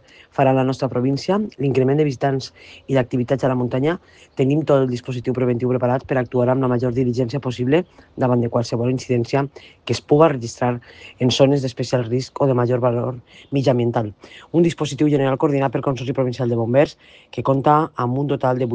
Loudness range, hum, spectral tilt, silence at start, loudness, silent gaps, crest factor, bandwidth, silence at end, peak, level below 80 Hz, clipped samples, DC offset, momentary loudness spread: 1 LU; none; -7 dB/octave; 0.4 s; -20 LUFS; none; 20 dB; 9.2 kHz; 0 s; 0 dBFS; -54 dBFS; under 0.1%; under 0.1%; 8 LU